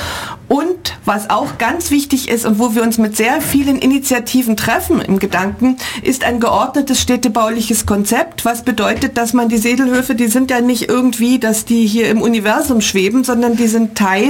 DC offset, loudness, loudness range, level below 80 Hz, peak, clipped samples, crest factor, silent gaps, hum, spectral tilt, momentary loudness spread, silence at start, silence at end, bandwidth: under 0.1%; -14 LUFS; 1 LU; -40 dBFS; -2 dBFS; under 0.1%; 12 dB; none; none; -4 dB/octave; 4 LU; 0 s; 0 s; 17 kHz